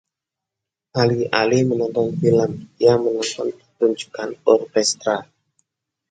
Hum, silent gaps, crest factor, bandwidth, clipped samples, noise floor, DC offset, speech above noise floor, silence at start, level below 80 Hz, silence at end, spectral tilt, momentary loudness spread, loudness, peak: none; none; 20 dB; 9.4 kHz; under 0.1%; -85 dBFS; under 0.1%; 66 dB; 0.95 s; -60 dBFS; 0.9 s; -5 dB/octave; 10 LU; -20 LUFS; 0 dBFS